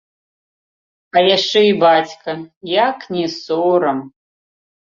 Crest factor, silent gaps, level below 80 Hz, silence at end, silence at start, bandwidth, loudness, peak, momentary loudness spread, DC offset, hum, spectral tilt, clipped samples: 16 dB; 2.56-2.61 s; -64 dBFS; 0.8 s; 1.15 s; 7.4 kHz; -15 LUFS; 0 dBFS; 13 LU; under 0.1%; none; -4.5 dB/octave; under 0.1%